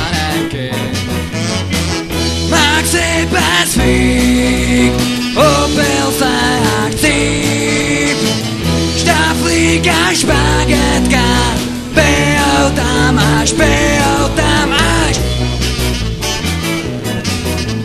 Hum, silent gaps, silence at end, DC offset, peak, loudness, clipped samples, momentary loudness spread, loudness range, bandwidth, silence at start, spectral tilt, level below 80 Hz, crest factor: none; none; 0 s; under 0.1%; 0 dBFS; -12 LUFS; under 0.1%; 7 LU; 2 LU; 14 kHz; 0 s; -4 dB/octave; -22 dBFS; 12 dB